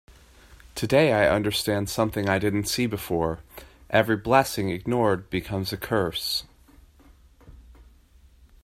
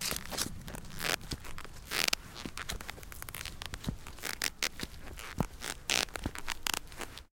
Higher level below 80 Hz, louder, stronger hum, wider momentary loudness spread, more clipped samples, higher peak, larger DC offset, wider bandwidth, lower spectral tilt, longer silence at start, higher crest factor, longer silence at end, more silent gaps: about the same, -50 dBFS vs -48 dBFS; first, -24 LUFS vs -36 LUFS; neither; second, 9 LU vs 14 LU; neither; about the same, -4 dBFS vs -4 dBFS; neither; about the same, 16 kHz vs 17 kHz; first, -5 dB/octave vs -2 dB/octave; about the same, 0.1 s vs 0 s; second, 22 dB vs 34 dB; first, 0.8 s vs 0.05 s; neither